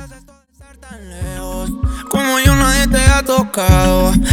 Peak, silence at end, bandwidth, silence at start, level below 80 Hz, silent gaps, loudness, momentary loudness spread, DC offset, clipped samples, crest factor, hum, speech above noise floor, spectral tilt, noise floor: 0 dBFS; 0 s; 19 kHz; 0 s; -20 dBFS; none; -14 LUFS; 14 LU; under 0.1%; under 0.1%; 14 dB; none; 33 dB; -4.5 dB/octave; -44 dBFS